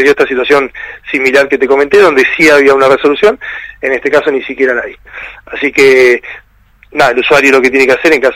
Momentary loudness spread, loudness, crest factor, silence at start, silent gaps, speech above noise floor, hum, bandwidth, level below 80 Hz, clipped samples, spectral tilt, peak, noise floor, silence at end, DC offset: 16 LU; -8 LUFS; 8 dB; 0 s; none; 34 dB; none; 15.5 kHz; -42 dBFS; 1%; -3.5 dB/octave; 0 dBFS; -42 dBFS; 0 s; under 0.1%